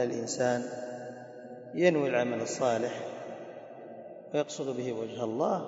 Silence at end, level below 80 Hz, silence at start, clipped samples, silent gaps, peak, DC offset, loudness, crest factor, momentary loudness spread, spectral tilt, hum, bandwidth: 0 s; -78 dBFS; 0 s; under 0.1%; none; -10 dBFS; under 0.1%; -31 LUFS; 22 dB; 19 LU; -5 dB/octave; none; 8 kHz